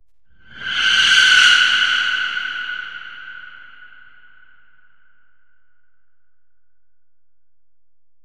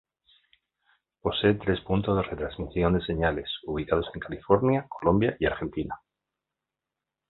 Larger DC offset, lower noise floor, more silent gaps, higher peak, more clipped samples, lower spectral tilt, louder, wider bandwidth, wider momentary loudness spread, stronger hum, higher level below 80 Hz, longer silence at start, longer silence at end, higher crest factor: first, 0.7% vs under 0.1%; second, -83 dBFS vs -88 dBFS; neither; first, 0 dBFS vs -6 dBFS; neither; second, 2.5 dB/octave vs -10.5 dB/octave; first, -13 LUFS vs -27 LUFS; first, 13.5 kHz vs 4.3 kHz; first, 24 LU vs 10 LU; neither; second, -60 dBFS vs -44 dBFS; second, 0.55 s vs 1.25 s; first, 4.7 s vs 1.35 s; about the same, 20 dB vs 22 dB